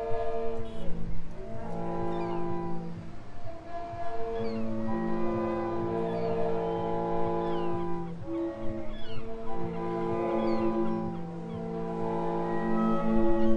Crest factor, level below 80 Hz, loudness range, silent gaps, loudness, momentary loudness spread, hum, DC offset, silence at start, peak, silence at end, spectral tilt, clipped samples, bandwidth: 16 dB; -44 dBFS; 6 LU; none; -33 LUFS; 12 LU; none; under 0.1%; 0 s; -12 dBFS; 0 s; -8.5 dB/octave; under 0.1%; 6.4 kHz